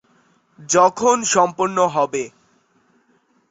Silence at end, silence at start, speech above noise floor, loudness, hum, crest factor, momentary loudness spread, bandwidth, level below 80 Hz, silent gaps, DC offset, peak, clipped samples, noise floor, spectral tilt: 1.2 s; 0.6 s; 44 dB; -17 LUFS; none; 18 dB; 9 LU; 8 kHz; -62 dBFS; none; under 0.1%; -2 dBFS; under 0.1%; -61 dBFS; -3 dB/octave